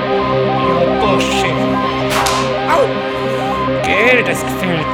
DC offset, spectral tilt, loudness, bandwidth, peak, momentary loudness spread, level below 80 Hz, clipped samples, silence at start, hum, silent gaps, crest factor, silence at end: under 0.1%; -4.5 dB/octave; -14 LUFS; 18 kHz; 0 dBFS; 6 LU; -36 dBFS; under 0.1%; 0 s; none; none; 14 dB; 0 s